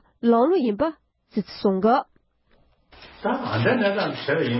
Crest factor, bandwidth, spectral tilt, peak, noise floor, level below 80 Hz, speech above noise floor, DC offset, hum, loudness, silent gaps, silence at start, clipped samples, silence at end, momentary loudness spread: 16 dB; 5.8 kHz; -11 dB/octave; -8 dBFS; -61 dBFS; -58 dBFS; 40 dB; under 0.1%; none; -23 LUFS; none; 0.25 s; under 0.1%; 0 s; 11 LU